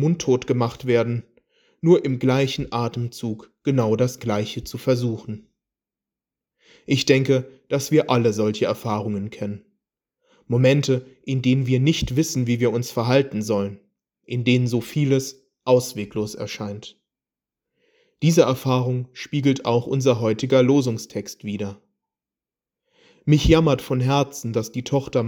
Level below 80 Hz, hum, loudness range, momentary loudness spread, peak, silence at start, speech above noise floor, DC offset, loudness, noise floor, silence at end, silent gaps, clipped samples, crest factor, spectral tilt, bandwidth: -44 dBFS; none; 4 LU; 13 LU; -2 dBFS; 0 s; over 69 dB; under 0.1%; -22 LUFS; under -90 dBFS; 0 s; none; under 0.1%; 20 dB; -6 dB/octave; over 20 kHz